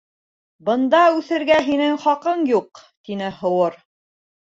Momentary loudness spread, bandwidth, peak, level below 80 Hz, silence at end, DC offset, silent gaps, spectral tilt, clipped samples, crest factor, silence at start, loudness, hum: 12 LU; 7.8 kHz; -2 dBFS; -62 dBFS; 0.65 s; under 0.1%; 2.97-3.04 s; -5.5 dB/octave; under 0.1%; 18 dB; 0.65 s; -19 LUFS; none